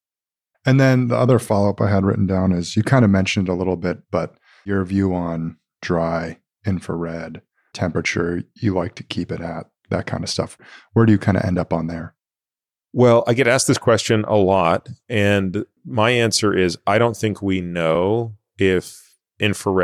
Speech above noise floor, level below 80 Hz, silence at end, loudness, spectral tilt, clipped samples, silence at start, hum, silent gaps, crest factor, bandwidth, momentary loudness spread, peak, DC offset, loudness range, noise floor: over 71 dB; -50 dBFS; 0 s; -19 LUFS; -5.5 dB/octave; under 0.1%; 0.65 s; none; none; 16 dB; 14.5 kHz; 13 LU; -4 dBFS; under 0.1%; 7 LU; under -90 dBFS